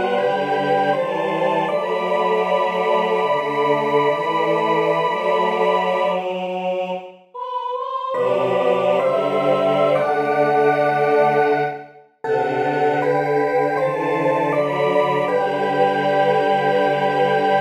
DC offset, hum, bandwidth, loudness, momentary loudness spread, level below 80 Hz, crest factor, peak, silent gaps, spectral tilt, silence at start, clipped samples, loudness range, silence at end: under 0.1%; none; 14.5 kHz; -19 LUFS; 6 LU; -66 dBFS; 14 dB; -4 dBFS; none; -6 dB/octave; 0 s; under 0.1%; 3 LU; 0 s